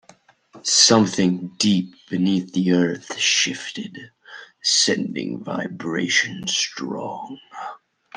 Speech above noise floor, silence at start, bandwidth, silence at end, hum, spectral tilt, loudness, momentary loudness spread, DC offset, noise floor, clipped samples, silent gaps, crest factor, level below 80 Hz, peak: 32 dB; 0.55 s; 10.5 kHz; 0.4 s; none; -3 dB/octave; -20 LUFS; 19 LU; under 0.1%; -53 dBFS; under 0.1%; none; 20 dB; -66 dBFS; -2 dBFS